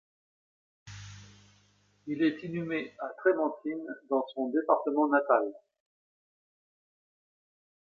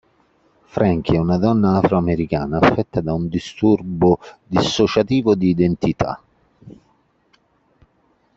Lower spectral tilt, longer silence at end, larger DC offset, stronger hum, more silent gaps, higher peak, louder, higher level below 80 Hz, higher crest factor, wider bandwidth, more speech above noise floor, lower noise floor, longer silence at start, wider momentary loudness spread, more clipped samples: about the same, -7 dB/octave vs -7 dB/octave; first, 2.4 s vs 1.65 s; neither; neither; neither; second, -10 dBFS vs -2 dBFS; second, -30 LUFS vs -18 LUFS; second, -72 dBFS vs -44 dBFS; about the same, 22 dB vs 18 dB; about the same, 7.2 kHz vs 7.8 kHz; second, 37 dB vs 44 dB; first, -67 dBFS vs -61 dBFS; about the same, 0.85 s vs 0.75 s; first, 20 LU vs 7 LU; neither